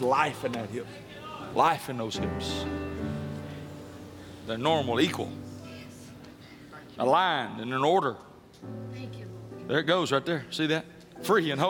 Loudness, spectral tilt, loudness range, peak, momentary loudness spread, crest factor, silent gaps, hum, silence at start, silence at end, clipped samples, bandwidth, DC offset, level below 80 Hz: -28 LUFS; -5 dB/octave; 3 LU; -10 dBFS; 20 LU; 20 dB; none; none; 0 s; 0 s; under 0.1%; 18 kHz; under 0.1%; -58 dBFS